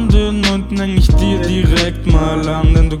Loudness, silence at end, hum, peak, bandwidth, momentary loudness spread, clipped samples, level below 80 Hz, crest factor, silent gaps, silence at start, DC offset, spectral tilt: -14 LUFS; 0 s; none; 0 dBFS; 12 kHz; 3 LU; under 0.1%; -14 dBFS; 12 dB; none; 0 s; under 0.1%; -6 dB/octave